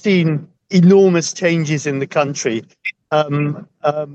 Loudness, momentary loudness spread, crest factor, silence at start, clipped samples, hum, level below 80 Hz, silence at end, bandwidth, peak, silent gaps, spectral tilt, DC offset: -16 LUFS; 12 LU; 14 dB; 0.05 s; under 0.1%; none; -66 dBFS; 0 s; 8.4 kHz; -2 dBFS; none; -6 dB/octave; under 0.1%